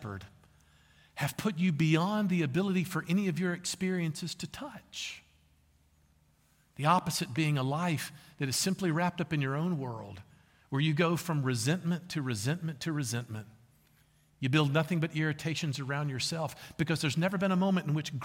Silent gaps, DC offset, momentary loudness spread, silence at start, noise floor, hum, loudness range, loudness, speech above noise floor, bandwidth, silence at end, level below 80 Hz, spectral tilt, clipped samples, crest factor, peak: none; under 0.1%; 12 LU; 0 s; -68 dBFS; none; 4 LU; -32 LUFS; 36 dB; 16.5 kHz; 0 s; -66 dBFS; -5 dB/octave; under 0.1%; 20 dB; -12 dBFS